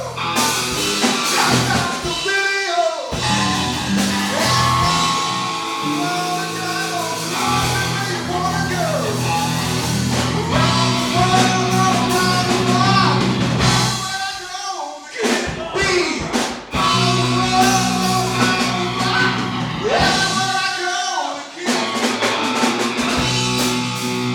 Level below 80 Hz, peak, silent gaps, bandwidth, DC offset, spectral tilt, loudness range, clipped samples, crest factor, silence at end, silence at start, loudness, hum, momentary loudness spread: -40 dBFS; -2 dBFS; none; 18 kHz; under 0.1%; -3.5 dB/octave; 4 LU; under 0.1%; 16 dB; 0 s; 0 s; -17 LUFS; none; 6 LU